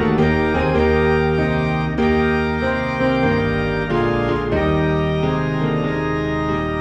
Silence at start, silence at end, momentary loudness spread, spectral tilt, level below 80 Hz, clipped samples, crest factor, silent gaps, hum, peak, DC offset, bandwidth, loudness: 0 s; 0 s; 4 LU; -8 dB/octave; -30 dBFS; under 0.1%; 12 dB; none; none; -6 dBFS; under 0.1%; 8 kHz; -18 LUFS